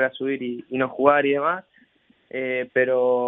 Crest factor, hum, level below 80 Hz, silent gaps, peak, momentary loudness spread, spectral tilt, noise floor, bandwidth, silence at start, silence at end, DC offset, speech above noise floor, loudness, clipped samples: 20 dB; none; -70 dBFS; none; -2 dBFS; 11 LU; -8.5 dB/octave; -60 dBFS; 3.9 kHz; 0 s; 0 s; under 0.1%; 38 dB; -22 LUFS; under 0.1%